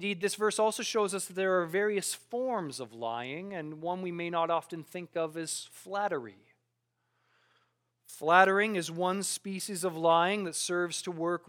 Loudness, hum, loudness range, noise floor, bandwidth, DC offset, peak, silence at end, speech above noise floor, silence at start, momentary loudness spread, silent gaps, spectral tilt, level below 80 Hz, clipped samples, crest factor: -31 LUFS; none; 9 LU; -80 dBFS; 18 kHz; under 0.1%; -8 dBFS; 0.1 s; 49 dB; 0 s; 13 LU; none; -3.5 dB/octave; -88 dBFS; under 0.1%; 24 dB